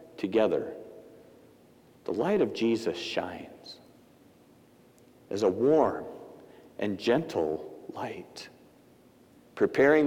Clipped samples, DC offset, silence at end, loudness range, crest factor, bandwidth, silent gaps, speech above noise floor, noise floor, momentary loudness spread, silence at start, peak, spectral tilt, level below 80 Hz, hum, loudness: under 0.1%; under 0.1%; 0 s; 4 LU; 20 dB; 16 kHz; none; 31 dB; -58 dBFS; 23 LU; 0 s; -10 dBFS; -6 dB/octave; -70 dBFS; none; -29 LUFS